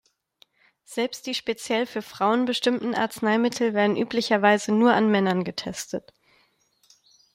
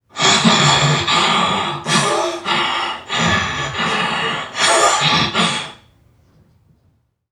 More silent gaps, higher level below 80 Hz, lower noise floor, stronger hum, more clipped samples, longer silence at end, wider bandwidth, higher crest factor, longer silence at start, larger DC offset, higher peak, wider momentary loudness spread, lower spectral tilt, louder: neither; second, -68 dBFS vs -48 dBFS; first, -65 dBFS vs -60 dBFS; neither; neither; second, 1.35 s vs 1.6 s; first, 16 kHz vs 14.5 kHz; about the same, 20 dB vs 16 dB; first, 0.9 s vs 0.15 s; neither; second, -6 dBFS vs 0 dBFS; about the same, 11 LU vs 9 LU; first, -4.5 dB/octave vs -2.5 dB/octave; second, -24 LUFS vs -15 LUFS